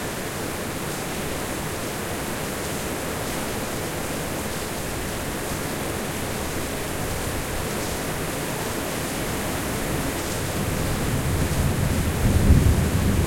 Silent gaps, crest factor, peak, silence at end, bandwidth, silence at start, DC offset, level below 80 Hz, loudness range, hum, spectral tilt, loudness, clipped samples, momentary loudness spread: none; 20 dB; -4 dBFS; 0 s; 16.5 kHz; 0 s; under 0.1%; -32 dBFS; 5 LU; none; -4.5 dB/octave; -26 LUFS; under 0.1%; 6 LU